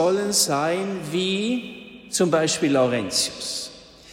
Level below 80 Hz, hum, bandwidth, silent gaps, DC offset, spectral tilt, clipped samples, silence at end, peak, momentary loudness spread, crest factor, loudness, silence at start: -60 dBFS; none; 16.5 kHz; none; under 0.1%; -3.5 dB/octave; under 0.1%; 0 s; -6 dBFS; 10 LU; 16 dB; -22 LUFS; 0 s